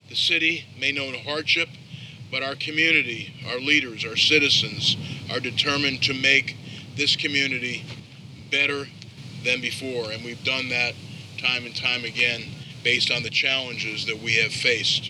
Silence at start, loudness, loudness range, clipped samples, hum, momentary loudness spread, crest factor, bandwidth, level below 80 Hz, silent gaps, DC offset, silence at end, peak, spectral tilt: 0.1 s; -22 LUFS; 5 LU; under 0.1%; none; 14 LU; 22 dB; 13.5 kHz; -66 dBFS; none; under 0.1%; 0 s; -2 dBFS; -2.5 dB/octave